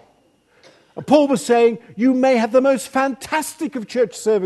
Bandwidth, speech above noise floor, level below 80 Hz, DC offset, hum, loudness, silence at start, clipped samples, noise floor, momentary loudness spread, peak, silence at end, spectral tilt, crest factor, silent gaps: 13 kHz; 40 dB; -64 dBFS; under 0.1%; none; -18 LUFS; 0.95 s; under 0.1%; -58 dBFS; 10 LU; 0 dBFS; 0 s; -4.5 dB/octave; 18 dB; none